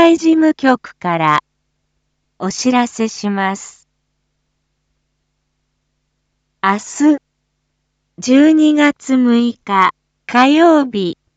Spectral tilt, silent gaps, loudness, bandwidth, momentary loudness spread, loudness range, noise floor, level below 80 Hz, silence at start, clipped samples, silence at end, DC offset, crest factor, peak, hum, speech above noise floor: -4.5 dB/octave; none; -14 LUFS; 8 kHz; 10 LU; 13 LU; -69 dBFS; -62 dBFS; 0 s; under 0.1%; 0.25 s; under 0.1%; 16 dB; 0 dBFS; none; 56 dB